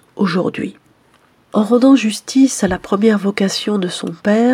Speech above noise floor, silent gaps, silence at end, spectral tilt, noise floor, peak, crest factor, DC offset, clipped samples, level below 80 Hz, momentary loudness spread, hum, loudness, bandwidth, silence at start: 39 dB; none; 0 s; -5 dB/octave; -53 dBFS; 0 dBFS; 14 dB; under 0.1%; under 0.1%; -50 dBFS; 10 LU; none; -15 LUFS; 14 kHz; 0.15 s